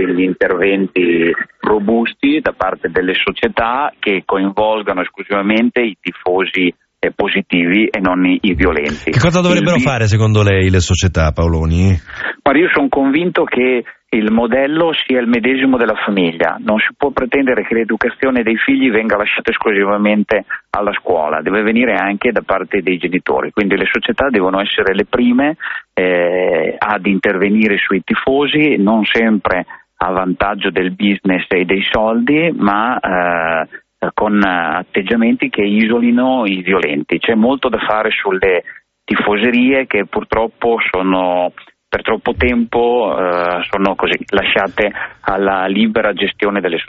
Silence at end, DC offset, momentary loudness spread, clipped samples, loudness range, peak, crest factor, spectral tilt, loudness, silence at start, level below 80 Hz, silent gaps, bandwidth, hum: 0.05 s; under 0.1%; 5 LU; under 0.1%; 2 LU; 0 dBFS; 14 dB; -4 dB/octave; -14 LUFS; 0 s; -38 dBFS; none; 7.6 kHz; none